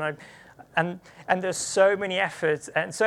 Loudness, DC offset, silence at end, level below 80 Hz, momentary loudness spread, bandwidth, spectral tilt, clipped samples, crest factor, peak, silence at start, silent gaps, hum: -25 LUFS; under 0.1%; 0 s; -68 dBFS; 11 LU; 13.5 kHz; -3.5 dB/octave; under 0.1%; 20 dB; -6 dBFS; 0 s; none; none